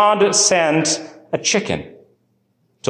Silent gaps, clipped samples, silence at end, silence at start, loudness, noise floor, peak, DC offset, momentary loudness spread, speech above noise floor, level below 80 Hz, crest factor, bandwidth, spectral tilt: none; under 0.1%; 0 s; 0 s; -17 LUFS; -64 dBFS; -4 dBFS; under 0.1%; 13 LU; 48 dB; -54 dBFS; 14 dB; 12.5 kHz; -2.5 dB/octave